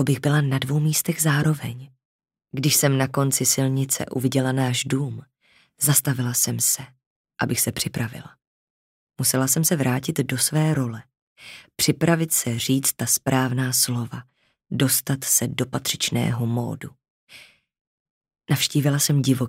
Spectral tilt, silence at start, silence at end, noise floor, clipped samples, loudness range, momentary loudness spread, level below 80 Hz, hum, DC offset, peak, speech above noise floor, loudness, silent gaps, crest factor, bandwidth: -4 dB/octave; 0 s; 0 s; -49 dBFS; under 0.1%; 3 LU; 12 LU; -60 dBFS; none; under 0.1%; -4 dBFS; 27 dB; -21 LUFS; 2.05-2.19 s, 7.06-7.24 s, 8.47-9.07 s, 11.22-11.36 s, 17.10-17.27 s, 17.81-18.21 s; 20 dB; 16.5 kHz